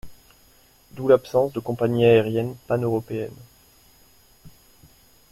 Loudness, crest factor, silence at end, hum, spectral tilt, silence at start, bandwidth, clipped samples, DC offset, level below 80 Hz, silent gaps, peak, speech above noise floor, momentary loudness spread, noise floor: -22 LUFS; 20 dB; 0.85 s; none; -7.5 dB/octave; 0.05 s; 15.5 kHz; under 0.1%; under 0.1%; -56 dBFS; none; -4 dBFS; 35 dB; 13 LU; -56 dBFS